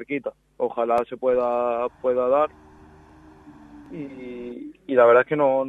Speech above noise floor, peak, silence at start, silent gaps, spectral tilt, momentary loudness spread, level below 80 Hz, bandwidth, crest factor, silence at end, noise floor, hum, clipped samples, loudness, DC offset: 27 dB; -6 dBFS; 0 s; none; -7.5 dB/octave; 20 LU; -60 dBFS; 4.6 kHz; 18 dB; 0 s; -49 dBFS; none; under 0.1%; -21 LUFS; under 0.1%